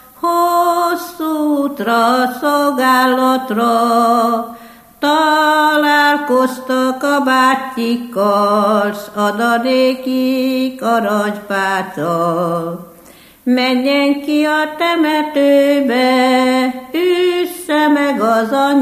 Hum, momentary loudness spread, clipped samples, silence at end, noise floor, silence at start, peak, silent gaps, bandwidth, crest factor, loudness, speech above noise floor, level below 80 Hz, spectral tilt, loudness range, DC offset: none; 7 LU; under 0.1%; 0 s; -42 dBFS; 0.2 s; 0 dBFS; none; 15 kHz; 14 dB; -14 LUFS; 29 dB; -60 dBFS; -4.5 dB/octave; 3 LU; under 0.1%